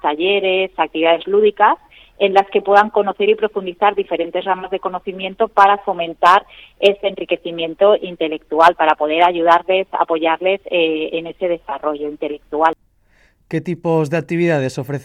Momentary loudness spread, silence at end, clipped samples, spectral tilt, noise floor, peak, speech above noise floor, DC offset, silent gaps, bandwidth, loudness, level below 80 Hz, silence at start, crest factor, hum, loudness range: 10 LU; 0 s; under 0.1%; -6 dB/octave; -55 dBFS; 0 dBFS; 39 dB; under 0.1%; none; 11.5 kHz; -16 LUFS; -56 dBFS; 0.05 s; 16 dB; none; 5 LU